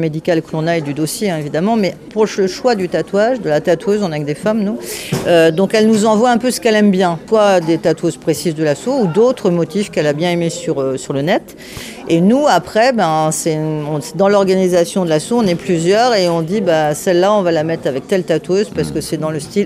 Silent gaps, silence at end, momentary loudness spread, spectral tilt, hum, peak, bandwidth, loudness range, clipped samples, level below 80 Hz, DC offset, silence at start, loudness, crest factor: none; 0 s; 7 LU; -5.5 dB/octave; none; -2 dBFS; 16 kHz; 3 LU; under 0.1%; -50 dBFS; under 0.1%; 0 s; -15 LUFS; 12 dB